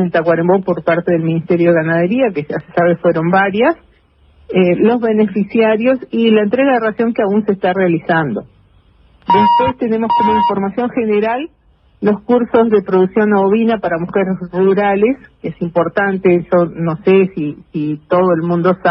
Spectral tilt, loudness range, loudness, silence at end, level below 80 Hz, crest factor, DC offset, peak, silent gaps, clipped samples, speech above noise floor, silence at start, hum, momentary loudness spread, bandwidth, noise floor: -10.5 dB/octave; 2 LU; -14 LUFS; 0 s; -50 dBFS; 14 dB; under 0.1%; 0 dBFS; none; under 0.1%; 37 dB; 0 s; none; 7 LU; 5.6 kHz; -50 dBFS